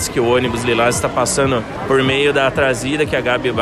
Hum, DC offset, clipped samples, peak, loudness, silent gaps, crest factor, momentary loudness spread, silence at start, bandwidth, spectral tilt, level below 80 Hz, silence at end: none; under 0.1%; under 0.1%; -4 dBFS; -16 LUFS; none; 12 dB; 4 LU; 0 s; 14 kHz; -4 dB/octave; -38 dBFS; 0 s